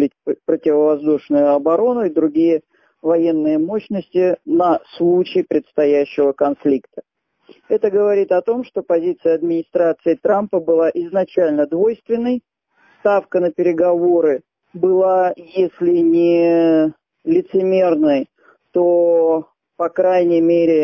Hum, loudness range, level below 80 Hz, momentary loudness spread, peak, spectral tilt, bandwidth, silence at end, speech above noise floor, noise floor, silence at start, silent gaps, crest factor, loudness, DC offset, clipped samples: none; 3 LU; -64 dBFS; 7 LU; -4 dBFS; -9 dB/octave; 6 kHz; 0 s; 41 dB; -56 dBFS; 0 s; none; 12 dB; -17 LUFS; under 0.1%; under 0.1%